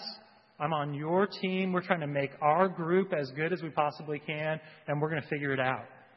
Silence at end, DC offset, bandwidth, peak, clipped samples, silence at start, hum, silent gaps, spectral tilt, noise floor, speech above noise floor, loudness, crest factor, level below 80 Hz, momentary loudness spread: 0.2 s; under 0.1%; 6 kHz; -8 dBFS; under 0.1%; 0 s; none; none; -8.5 dB/octave; -52 dBFS; 21 dB; -31 LUFS; 24 dB; -78 dBFS; 9 LU